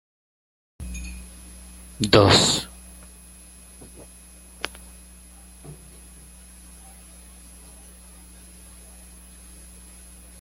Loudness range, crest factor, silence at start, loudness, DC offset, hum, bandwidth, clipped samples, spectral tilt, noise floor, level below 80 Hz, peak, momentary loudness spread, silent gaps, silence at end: 22 LU; 26 dB; 0.8 s; -20 LUFS; under 0.1%; none; 16.5 kHz; under 0.1%; -3.5 dB/octave; -47 dBFS; -46 dBFS; -2 dBFS; 27 LU; none; 4.65 s